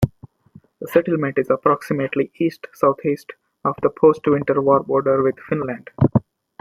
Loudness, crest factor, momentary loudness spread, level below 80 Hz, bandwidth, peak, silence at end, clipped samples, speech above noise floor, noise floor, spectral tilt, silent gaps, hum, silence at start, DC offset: -20 LUFS; 18 dB; 8 LU; -50 dBFS; 15.5 kHz; -2 dBFS; 0.4 s; under 0.1%; 31 dB; -50 dBFS; -8.5 dB/octave; none; none; 0 s; under 0.1%